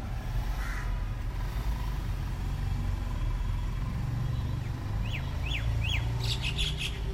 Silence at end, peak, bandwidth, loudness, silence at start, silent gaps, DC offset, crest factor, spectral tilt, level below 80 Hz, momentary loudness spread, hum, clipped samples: 0 s; -18 dBFS; 16 kHz; -33 LUFS; 0 s; none; under 0.1%; 14 dB; -5 dB/octave; -34 dBFS; 5 LU; none; under 0.1%